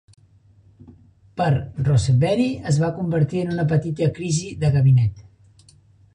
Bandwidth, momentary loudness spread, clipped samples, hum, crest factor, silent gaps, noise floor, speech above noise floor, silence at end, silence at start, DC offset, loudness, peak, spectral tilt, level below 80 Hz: 10.5 kHz; 7 LU; under 0.1%; none; 14 dB; none; -53 dBFS; 34 dB; 0.95 s; 0.9 s; under 0.1%; -20 LUFS; -8 dBFS; -7 dB/octave; -44 dBFS